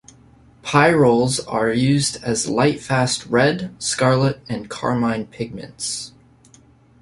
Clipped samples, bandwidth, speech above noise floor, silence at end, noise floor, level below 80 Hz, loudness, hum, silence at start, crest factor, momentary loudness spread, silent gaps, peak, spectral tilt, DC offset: under 0.1%; 11.5 kHz; 32 dB; 0.9 s; -51 dBFS; -50 dBFS; -19 LUFS; none; 0.65 s; 18 dB; 14 LU; none; -2 dBFS; -4.5 dB/octave; under 0.1%